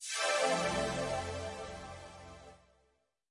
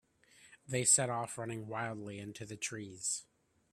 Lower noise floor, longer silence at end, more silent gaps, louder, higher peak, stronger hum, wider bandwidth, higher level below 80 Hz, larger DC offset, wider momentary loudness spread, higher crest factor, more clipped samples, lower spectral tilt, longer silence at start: first, -76 dBFS vs -64 dBFS; first, 0.75 s vs 0.5 s; neither; about the same, -34 LUFS vs -35 LUFS; about the same, -18 dBFS vs -16 dBFS; neither; second, 11.5 kHz vs 15.5 kHz; first, -58 dBFS vs -76 dBFS; neither; first, 21 LU vs 17 LU; second, 18 dB vs 24 dB; neither; about the same, -3 dB/octave vs -2.5 dB/octave; second, 0 s vs 0.4 s